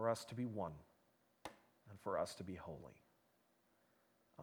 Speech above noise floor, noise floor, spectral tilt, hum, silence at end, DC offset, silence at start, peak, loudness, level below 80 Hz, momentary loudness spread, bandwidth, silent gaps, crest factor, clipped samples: 32 dB; -78 dBFS; -5.5 dB/octave; none; 0 s; under 0.1%; 0 s; -24 dBFS; -47 LUFS; -76 dBFS; 19 LU; 19.5 kHz; none; 24 dB; under 0.1%